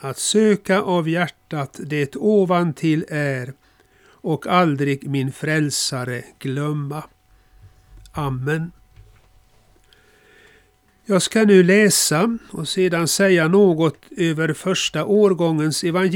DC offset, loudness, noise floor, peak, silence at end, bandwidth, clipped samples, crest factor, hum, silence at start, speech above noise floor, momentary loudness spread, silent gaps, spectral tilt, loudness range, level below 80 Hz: under 0.1%; -19 LUFS; -57 dBFS; -2 dBFS; 0 s; 18.5 kHz; under 0.1%; 18 dB; none; 0 s; 39 dB; 13 LU; none; -4.5 dB/octave; 14 LU; -56 dBFS